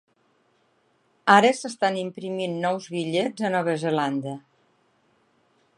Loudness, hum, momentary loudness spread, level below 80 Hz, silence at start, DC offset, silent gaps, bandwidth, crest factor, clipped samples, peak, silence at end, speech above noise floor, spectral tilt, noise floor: -24 LUFS; none; 14 LU; -78 dBFS; 1.25 s; under 0.1%; none; 11.5 kHz; 24 dB; under 0.1%; -2 dBFS; 1.4 s; 43 dB; -5 dB/octave; -66 dBFS